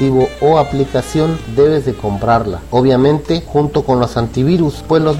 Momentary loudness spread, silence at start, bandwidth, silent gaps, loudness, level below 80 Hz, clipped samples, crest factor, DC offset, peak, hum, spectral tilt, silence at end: 4 LU; 0 s; 15.5 kHz; none; -14 LUFS; -32 dBFS; under 0.1%; 12 dB; under 0.1%; 0 dBFS; none; -7.5 dB/octave; 0 s